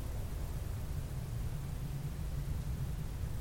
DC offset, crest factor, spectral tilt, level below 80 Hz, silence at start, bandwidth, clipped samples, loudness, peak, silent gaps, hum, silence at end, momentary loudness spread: under 0.1%; 12 dB; -6.5 dB/octave; -42 dBFS; 0 s; 17 kHz; under 0.1%; -41 LUFS; -26 dBFS; none; none; 0 s; 2 LU